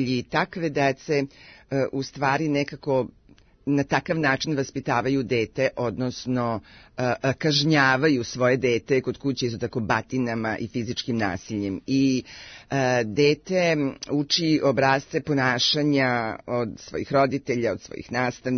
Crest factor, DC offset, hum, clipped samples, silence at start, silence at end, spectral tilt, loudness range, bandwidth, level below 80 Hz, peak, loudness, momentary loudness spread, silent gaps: 18 dB; under 0.1%; none; under 0.1%; 0 s; 0 s; -5 dB/octave; 4 LU; 6.6 kHz; -58 dBFS; -6 dBFS; -24 LUFS; 9 LU; none